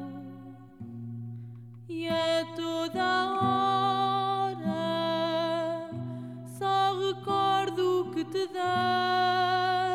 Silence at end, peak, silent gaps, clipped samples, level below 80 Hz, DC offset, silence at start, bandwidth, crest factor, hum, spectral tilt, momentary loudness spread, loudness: 0 s; -14 dBFS; none; under 0.1%; -72 dBFS; under 0.1%; 0 s; 14 kHz; 14 dB; none; -5.5 dB/octave; 16 LU; -28 LUFS